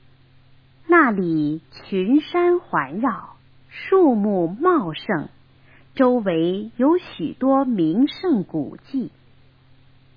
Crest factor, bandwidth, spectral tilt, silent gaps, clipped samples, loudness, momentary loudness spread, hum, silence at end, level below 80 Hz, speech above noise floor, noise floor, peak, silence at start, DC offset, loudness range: 18 dB; 5.2 kHz; -9.5 dB/octave; none; under 0.1%; -20 LUFS; 12 LU; none; 1.1 s; -60 dBFS; 32 dB; -52 dBFS; -4 dBFS; 0.9 s; under 0.1%; 2 LU